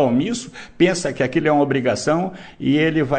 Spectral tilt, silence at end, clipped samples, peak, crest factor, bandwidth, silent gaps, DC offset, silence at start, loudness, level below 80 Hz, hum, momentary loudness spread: -5.5 dB/octave; 0 s; under 0.1%; -4 dBFS; 16 dB; 9.4 kHz; none; under 0.1%; 0 s; -19 LUFS; -50 dBFS; none; 9 LU